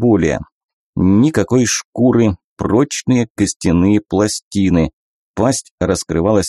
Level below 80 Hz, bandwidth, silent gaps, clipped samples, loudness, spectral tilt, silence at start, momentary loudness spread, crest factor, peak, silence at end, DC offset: -38 dBFS; 13 kHz; 0.52-0.93 s, 1.85-1.93 s, 2.44-2.57 s, 3.30-3.35 s, 3.56-3.60 s, 4.42-4.51 s, 4.93-5.34 s, 5.71-5.78 s; under 0.1%; -15 LUFS; -5.5 dB/octave; 0 s; 6 LU; 12 dB; -2 dBFS; 0 s; under 0.1%